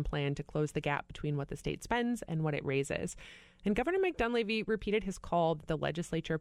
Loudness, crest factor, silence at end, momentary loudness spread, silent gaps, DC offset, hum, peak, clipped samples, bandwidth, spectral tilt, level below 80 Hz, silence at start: -34 LUFS; 16 dB; 0 s; 7 LU; none; under 0.1%; none; -18 dBFS; under 0.1%; 13 kHz; -6 dB/octave; -52 dBFS; 0 s